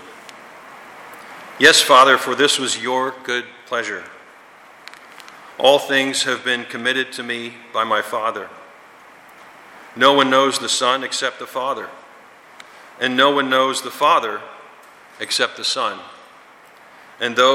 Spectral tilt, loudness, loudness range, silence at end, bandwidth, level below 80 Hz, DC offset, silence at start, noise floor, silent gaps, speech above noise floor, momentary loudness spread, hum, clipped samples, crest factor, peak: -1.5 dB/octave; -17 LUFS; 7 LU; 0 s; 16.5 kHz; -68 dBFS; under 0.1%; 0 s; -46 dBFS; none; 28 dB; 25 LU; none; under 0.1%; 20 dB; 0 dBFS